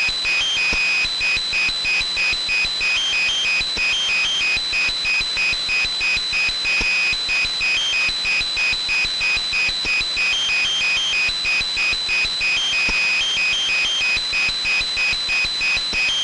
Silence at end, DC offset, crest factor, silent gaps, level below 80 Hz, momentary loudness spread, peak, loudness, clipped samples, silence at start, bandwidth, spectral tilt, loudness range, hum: 0 s; under 0.1%; 8 dB; none; -42 dBFS; 2 LU; -12 dBFS; -17 LUFS; under 0.1%; 0 s; 11.5 kHz; 0.5 dB/octave; 0 LU; none